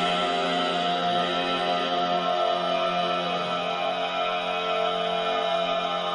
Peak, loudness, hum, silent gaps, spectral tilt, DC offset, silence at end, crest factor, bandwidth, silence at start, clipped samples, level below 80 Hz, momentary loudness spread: -14 dBFS; -25 LUFS; none; none; -4 dB/octave; under 0.1%; 0 s; 12 dB; 10.5 kHz; 0 s; under 0.1%; -64 dBFS; 2 LU